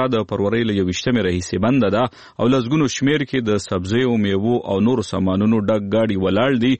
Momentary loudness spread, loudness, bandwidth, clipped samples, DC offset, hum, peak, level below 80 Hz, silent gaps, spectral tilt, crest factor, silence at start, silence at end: 4 LU; -19 LUFS; 8.8 kHz; under 0.1%; 0.3%; none; -4 dBFS; -48 dBFS; none; -6 dB/octave; 14 dB; 0 s; 0 s